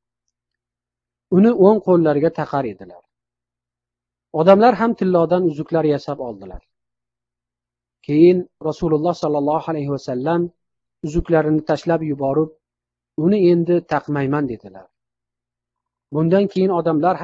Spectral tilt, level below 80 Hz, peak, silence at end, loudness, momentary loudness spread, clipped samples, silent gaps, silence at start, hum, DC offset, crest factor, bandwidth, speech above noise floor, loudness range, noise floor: -8.5 dB/octave; -44 dBFS; 0 dBFS; 0 s; -18 LUFS; 14 LU; under 0.1%; none; 1.3 s; 60 Hz at -55 dBFS; under 0.1%; 18 dB; 7.4 kHz; 70 dB; 3 LU; -87 dBFS